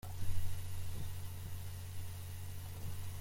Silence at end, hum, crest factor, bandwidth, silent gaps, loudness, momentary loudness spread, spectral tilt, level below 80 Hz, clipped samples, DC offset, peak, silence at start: 0 s; none; 16 dB; 16.5 kHz; none; -46 LUFS; 4 LU; -4.5 dB/octave; -50 dBFS; under 0.1%; under 0.1%; -22 dBFS; 0.05 s